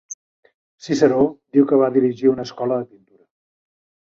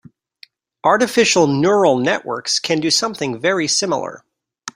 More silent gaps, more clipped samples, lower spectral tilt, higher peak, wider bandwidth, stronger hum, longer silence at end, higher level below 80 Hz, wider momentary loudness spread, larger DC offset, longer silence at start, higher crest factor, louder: first, 0.14-0.43 s, 0.54-0.78 s vs none; neither; first, -6.5 dB/octave vs -3 dB/octave; about the same, -2 dBFS vs -2 dBFS; second, 7.6 kHz vs 16 kHz; neither; first, 1.2 s vs 0.05 s; about the same, -60 dBFS vs -60 dBFS; first, 21 LU vs 8 LU; neither; second, 0.1 s vs 0.85 s; about the same, 18 dB vs 16 dB; about the same, -18 LUFS vs -16 LUFS